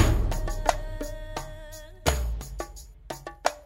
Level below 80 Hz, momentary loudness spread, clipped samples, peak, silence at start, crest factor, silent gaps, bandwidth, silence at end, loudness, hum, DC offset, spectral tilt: -32 dBFS; 14 LU; under 0.1%; -4 dBFS; 0 s; 24 dB; none; 16 kHz; 0 s; -31 LUFS; none; under 0.1%; -4.5 dB/octave